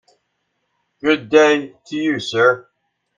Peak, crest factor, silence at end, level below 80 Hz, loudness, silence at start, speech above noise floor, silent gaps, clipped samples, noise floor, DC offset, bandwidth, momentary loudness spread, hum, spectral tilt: 0 dBFS; 18 dB; 0.55 s; -66 dBFS; -17 LUFS; 1.05 s; 55 dB; none; under 0.1%; -71 dBFS; under 0.1%; 7.6 kHz; 11 LU; none; -4.5 dB/octave